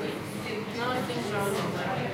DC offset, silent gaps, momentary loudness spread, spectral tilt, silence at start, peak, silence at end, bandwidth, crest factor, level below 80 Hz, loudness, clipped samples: under 0.1%; none; 5 LU; -5 dB/octave; 0 s; -18 dBFS; 0 s; 16 kHz; 14 dB; -62 dBFS; -31 LUFS; under 0.1%